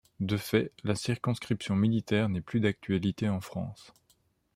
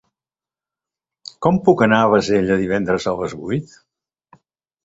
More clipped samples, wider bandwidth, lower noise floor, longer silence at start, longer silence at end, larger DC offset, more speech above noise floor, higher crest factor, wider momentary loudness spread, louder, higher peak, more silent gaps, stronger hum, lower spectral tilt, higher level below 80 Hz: neither; first, 16 kHz vs 8 kHz; second, -70 dBFS vs under -90 dBFS; second, 0.2 s vs 1.4 s; second, 0.75 s vs 1.2 s; neither; second, 40 dB vs over 73 dB; about the same, 20 dB vs 18 dB; second, 6 LU vs 12 LU; second, -30 LUFS vs -17 LUFS; second, -12 dBFS vs -2 dBFS; neither; neither; about the same, -6.5 dB/octave vs -6.5 dB/octave; second, -62 dBFS vs -50 dBFS